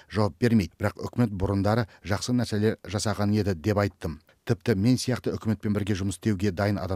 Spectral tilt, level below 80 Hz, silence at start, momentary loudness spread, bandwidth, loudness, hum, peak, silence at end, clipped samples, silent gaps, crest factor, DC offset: -6.5 dB/octave; -50 dBFS; 0.1 s; 6 LU; 15 kHz; -27 LUFS; none; -8 dBFS; 0 s; under 0.1%; none; 18 dB; under 0.1%